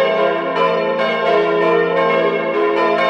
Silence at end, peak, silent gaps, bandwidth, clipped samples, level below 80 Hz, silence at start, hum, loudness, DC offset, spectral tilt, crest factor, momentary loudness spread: 0 s; -2 dBFS; none; 8.4 kHz; under 0.1%; -62 dBFS; 0 s; none; -16 LUFS; under 0.1%; -6 dB/octave; 12 dB; 2 LU